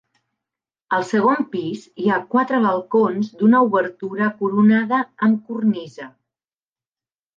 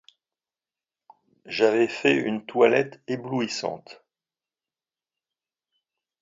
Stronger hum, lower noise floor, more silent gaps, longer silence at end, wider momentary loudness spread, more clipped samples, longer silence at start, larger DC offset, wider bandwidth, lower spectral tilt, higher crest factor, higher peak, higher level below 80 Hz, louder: neither; about the same, under -90 dBFS vs under -90 dBFS; neither; second, 1.3 s vs 2.3 s; about the same, 11 LU vs 13 LU; neither; second, 0.9 s vs 1.45 s; neither; about the same, 7.2 kHz vs 7.8 kHz; first, -7.5 dB/octave vs -5 dB/octave; second, 14 dB vs 24 dB; about the same, -6 dBFS vs -4 dBFS; about the same, -74 dBFS vs -74 dBFS; first, -19 LUFS vs -24 LUFS